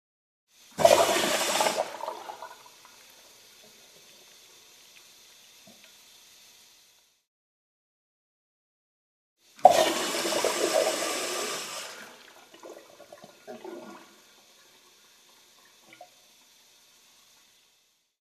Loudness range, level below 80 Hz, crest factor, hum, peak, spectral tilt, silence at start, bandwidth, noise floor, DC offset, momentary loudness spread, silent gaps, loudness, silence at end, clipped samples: 25 LU; -76 dBFS; 30 dB; none; 0 dBFS; -1.5 dB/octave; 0.75 s; 14 kHz; -69 dBFS; under 0.1%; 29 LU; 7.27-9.36 s; -25 LUFS; 2.3 s; under 0.1%